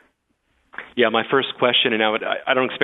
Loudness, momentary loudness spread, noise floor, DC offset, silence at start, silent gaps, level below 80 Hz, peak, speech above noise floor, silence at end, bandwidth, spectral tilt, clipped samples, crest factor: -19 LUFS; 14 LU; -68 dBFS; under 0.1%; 0.8 s; none; -68 dBFS; -2 dBFS; 48 dB; 0 s; 4.1 kHz; -7 dB/octave; under 0.1%; 20 dB